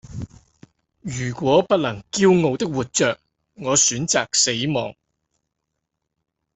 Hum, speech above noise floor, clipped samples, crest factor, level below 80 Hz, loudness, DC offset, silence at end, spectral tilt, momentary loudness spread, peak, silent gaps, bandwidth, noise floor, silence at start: none; 59 dB; under 0.1%; 20 dB; -54 dBFS; -19 LUFS; under 0.1%; 1.65 s; -3.5 dB/octave; 17 LU; -2 dBFS; none; 8.4 kHz; -79 dBFS; 0.1 s